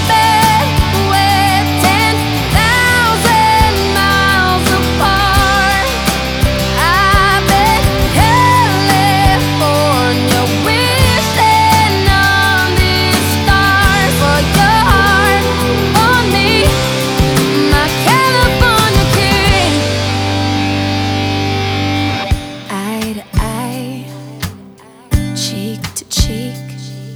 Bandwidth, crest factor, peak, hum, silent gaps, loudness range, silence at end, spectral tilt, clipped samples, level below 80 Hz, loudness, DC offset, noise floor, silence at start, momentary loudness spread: over 20 kHz; 12 dB; 0 dBFS; none; none; 9 LU; 0 s; -4 dB/octave; under 0.1%; -22 dBFS; -11 LUFS; under 0.1%; -37 dBFS; 0 s; 10 LU